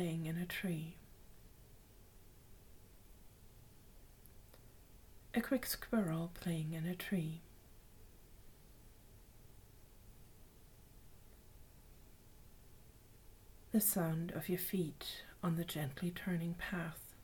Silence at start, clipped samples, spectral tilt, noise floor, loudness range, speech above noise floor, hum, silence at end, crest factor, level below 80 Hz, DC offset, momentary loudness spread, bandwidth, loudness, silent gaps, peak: 0 s; under 0.1%; -5 dB/octave; -61 dBFS; 24 LU; 22 dB; none; 0 s; 22 dB; -62 dBFS; under 0.1%; 25 LU; 19 kHz; -40 LUFS; none; -22 dBFS